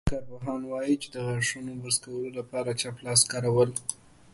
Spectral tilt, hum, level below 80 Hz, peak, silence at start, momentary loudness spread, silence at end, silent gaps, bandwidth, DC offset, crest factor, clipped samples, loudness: -3.5 dB/octave; none; -48 dBFS; -6 dBFS; 0.05 s; 13 LU; 0.4 s; none; 12 kHz; under 0.1%; 22 dB; under 0.1%; -28 LUFS